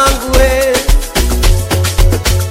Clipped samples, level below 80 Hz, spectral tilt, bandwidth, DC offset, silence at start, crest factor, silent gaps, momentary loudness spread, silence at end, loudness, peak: under 0.1%; -12 dBFS; -4 dB/octave; 16.5 kHz; under 0.1%; 0 s; 10 dB; none; 3 LU; 0 s; -12 LUFS; 0 dBFS